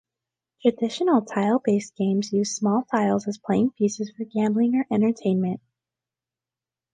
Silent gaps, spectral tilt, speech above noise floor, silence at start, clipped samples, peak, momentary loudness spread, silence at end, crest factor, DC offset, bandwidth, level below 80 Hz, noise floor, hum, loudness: none; -6 dB/octave; over 67 dB; 0.65 s; under 0.1%; -6 dBFS; 4 LU; 1.35 s; 18 dB; under 0.1%; 9.4 kHz; -68 dBFS; under -90 dBFS; none; -24 LUFS